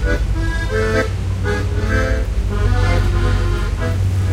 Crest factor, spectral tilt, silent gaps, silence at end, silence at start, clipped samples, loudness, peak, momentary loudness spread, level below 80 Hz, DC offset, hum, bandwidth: 12 dB; -6.5 dB/octave; none; 0 s; 0 s; under 0.1%; -19 LUFS; -4 dBFS; 4 LU; -20 dBFS; under 0.1%; none; 12.5 kHz